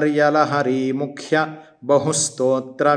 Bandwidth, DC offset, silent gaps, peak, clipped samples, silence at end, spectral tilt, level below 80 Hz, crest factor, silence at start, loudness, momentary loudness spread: 10.5 kHz; under 0.1%; none; -2 dBFS; under 0.1%; 0 s; -4 dB/octave; -70 dBFS; 16 dB; 0 s; -19 LUFS; 8 LU